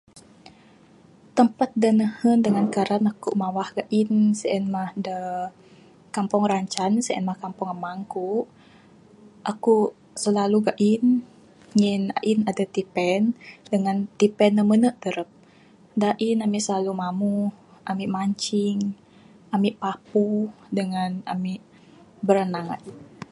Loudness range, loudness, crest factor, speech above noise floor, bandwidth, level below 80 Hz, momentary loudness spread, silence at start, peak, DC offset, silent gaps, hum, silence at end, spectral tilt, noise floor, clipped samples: 4 LU; -24 LUFS; 22 dB; 31 dB; 11.5 kHz; -68 dBFS; 11 LU; 0.15 s; -2 dBFS; under 0.1%; none; none; 0.05 s; -6 dB/octave; -53 dBFS; under 0.1%